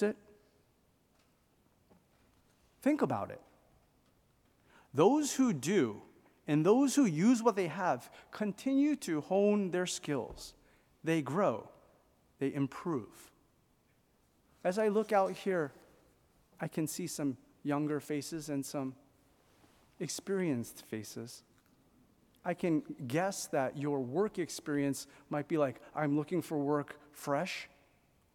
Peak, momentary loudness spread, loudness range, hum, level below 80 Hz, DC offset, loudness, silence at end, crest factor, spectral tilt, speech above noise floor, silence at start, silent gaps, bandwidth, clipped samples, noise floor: -14 dBFS; 15 LU; 9 LU; none; -72 dBFS; under 0.1%; -34 LUFS; 0.7 s; 22 dB; -5.5 dB/octave; 38 dB; 0 s; none; 17 kHz; under 0.1%; -71 dBFS